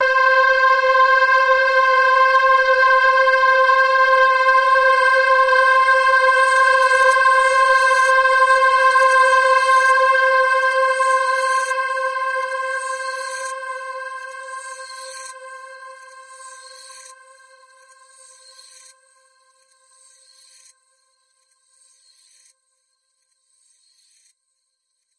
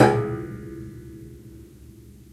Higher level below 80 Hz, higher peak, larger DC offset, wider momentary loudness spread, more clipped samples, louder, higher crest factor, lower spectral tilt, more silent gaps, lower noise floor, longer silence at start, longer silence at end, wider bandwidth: second, -58 dBFS vs -48 dBFS; second, -4 dBFS vs 0 dBFS; neither; second, 17 LU vs 22 LU; neither; first, -14 LUFS vs -27 LUFS; second, 12 dB vs 26 dB; second, 2.5 dB/octave vs -7 dB/octave; neither; first, -73 dBFS vs -46 dBFS; about the same, 0 s vs 0 s; first, 8.15 s vs 0.25 s; second, 11.5 kHz vs 14.5 kHz